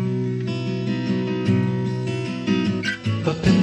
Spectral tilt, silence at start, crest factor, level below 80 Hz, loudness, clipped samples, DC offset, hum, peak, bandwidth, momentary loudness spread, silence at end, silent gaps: -7 dB/octave; 0 s; 16 dB; -48 dBFS; -23 LUFS; under 0.1%; under 0.1%; none; -6 dBFS; 9.2 kHz; 5 LU; 0 s; none